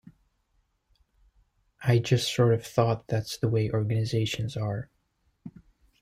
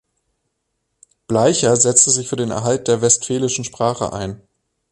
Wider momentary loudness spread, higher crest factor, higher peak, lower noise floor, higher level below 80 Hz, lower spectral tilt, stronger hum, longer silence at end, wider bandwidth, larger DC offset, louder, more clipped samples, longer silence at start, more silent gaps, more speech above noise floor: first, 17 LU vs 11 LU; about the same, 20 dB vs 18 dB; second, -8 dBFS vs 0 dBFS; about the same, -72 dBFS vs -73 dBFS; second, -58 dBFS vs -50 dBFS; first, -6 dB/octave vs -3.5 dB/octave; neither; about the same, 0.55 s vs 0.55 s; first, 15.5 kHz vs 11.5 kHz; neither; second, -27 LUFS vs -16 LUFS; neither; first, 1.8 s vs 1.3 s; neither; second, 46 dB vs 56 dB